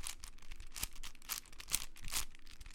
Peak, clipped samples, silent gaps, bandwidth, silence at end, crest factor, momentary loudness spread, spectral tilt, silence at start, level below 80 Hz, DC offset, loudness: -12 dBFS; under 0.1%; none; 17 kHz; 0 s; 30 dB; 15 LU; 0 dB/octave; 0 s; -50 dBFS; under 0.1%; -43 LUFS